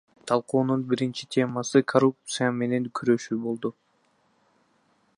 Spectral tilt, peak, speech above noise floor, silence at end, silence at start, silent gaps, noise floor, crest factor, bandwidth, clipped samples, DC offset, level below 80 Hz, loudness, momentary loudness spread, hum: -5.5 dB/octave; -4 dBFS; 42 dB; 1.45 s; 0.25 s; none; -67 dBFS; 22 dB; 11 kHz; under 0.1%; under 0.1%; -74 dBFS; -26 LUFS; 7 LU; none